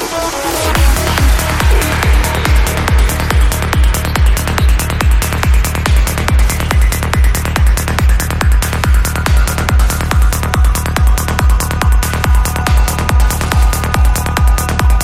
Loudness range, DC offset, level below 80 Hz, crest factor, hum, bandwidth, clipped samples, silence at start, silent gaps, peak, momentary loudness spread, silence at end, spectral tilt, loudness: 1 LU; under 0.1%; -12 dBFS; 10 dB; none; 16.5 kHz; under 0.1%; 0 s; none; 0 dBFS; 1 LU; 0 s; -4.5 dB/octave; -13 LUFS